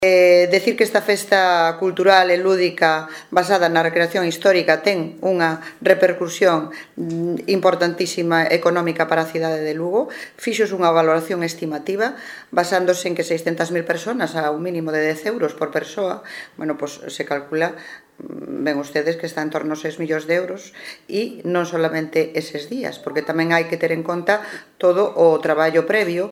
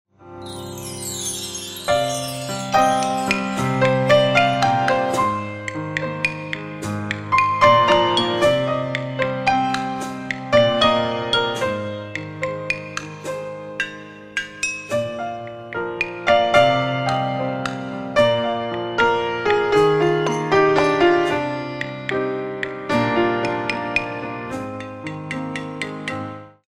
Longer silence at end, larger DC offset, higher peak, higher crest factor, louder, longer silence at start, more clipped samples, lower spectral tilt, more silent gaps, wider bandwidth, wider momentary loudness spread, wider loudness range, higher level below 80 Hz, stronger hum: second, 0 s vs 0.2 s; neither; about the same, 0 dBFS vs -2 dBFS; about the same, 18 dB vs 18 dB; about the same, -19 LUFS vs -20 LUFS; second, 0 s vs 0.2 s; neither; about the same, -4.5 dB/octave vs -4.5 dB/octave; neither; about the same, 16.5 kHz vs 15.5 kHz; about the same, 11 LU vs 13 LU; about the same, 8 LU vs 7 LU; second, -68 dBFS vs -52 dBFS; neither